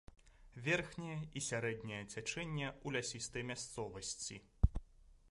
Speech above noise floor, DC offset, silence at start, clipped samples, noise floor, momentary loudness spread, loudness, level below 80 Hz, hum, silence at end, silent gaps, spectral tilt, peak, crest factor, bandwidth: 20 dB; under 0.1%; 0.25 s; under 0.1%; -63 dBFS; 8 LU; -42 LUFS; -48 dBFS; none; 0.15 s; none; -4 dB/octave; -16 dBFS; 26 dB; 11.5 kHz